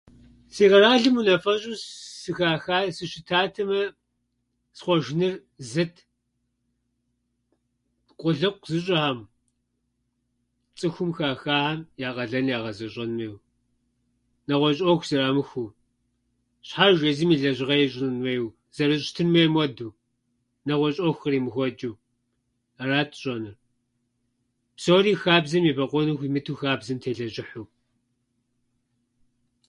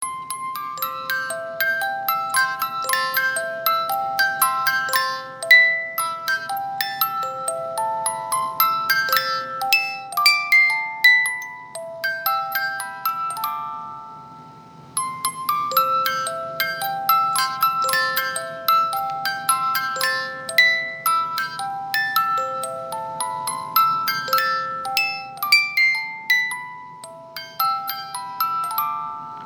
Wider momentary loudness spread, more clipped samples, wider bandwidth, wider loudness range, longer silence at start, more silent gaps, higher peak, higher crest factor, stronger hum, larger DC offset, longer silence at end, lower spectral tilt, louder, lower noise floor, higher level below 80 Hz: first, 16 LU vs 13 LU; neither; second, 11.5 kHz vs over 20 kHz; about the same, 7 LU vs 6 LU; first, 0.55 s vs 0 s; neither; second, -4 dBFS vs 0 dBFS; about the same, 22 dB vs 22 dB; neither; neither; first, 2.05 s vs 0 s; first, -5.5 dB/octave vs 0 dB/octave; second, -24 LUFS vs -20 LUFS; first, -76 dBFS vs -43 dBFS; first, -64 dBFS vs -70 dBFS